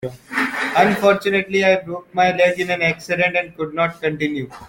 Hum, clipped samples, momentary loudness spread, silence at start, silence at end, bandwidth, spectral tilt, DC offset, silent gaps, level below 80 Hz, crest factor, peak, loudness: none; under 0.1%; 8 LU; 0 s; 0 s; 17 kHz; -5 dB/octave; under 0.1%; none; -56 dBFS; 18 dB; -2 dBFS; -18 LUFS